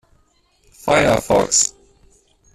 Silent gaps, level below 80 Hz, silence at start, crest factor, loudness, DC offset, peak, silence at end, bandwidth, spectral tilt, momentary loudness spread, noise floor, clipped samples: none; -44 dBFS; 0.85 s; 18 dB; -16 LUFS; under 0.1%; -2 dBFS; 0.9 s; 14.5 kHz; -2.5 dB/octave; 6 LU; -59 dBFS; under 0.1%